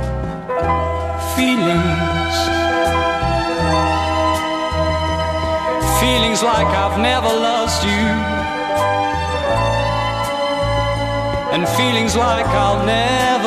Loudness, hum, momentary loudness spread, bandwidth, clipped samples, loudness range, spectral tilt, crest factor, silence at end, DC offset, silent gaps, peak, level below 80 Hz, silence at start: -17 LUFS; none; 5 LU; 14 kHz; under 0.1%; 2 LU; -4.5 dB/octave; 16 dB; 0 s; under 0.1%; none; -2 dBFS; -30 dBFS; 0 s